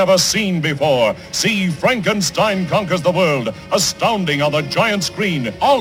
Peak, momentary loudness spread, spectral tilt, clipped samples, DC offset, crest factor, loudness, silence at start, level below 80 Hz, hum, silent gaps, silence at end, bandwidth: -2 dBFS; 3 LU; -4 dB/octave; under 0.1%; under 0.1%; 14 dB; -16 LUFS; 0 s; -48 dBFS; none; none; 0 s; 17 kHz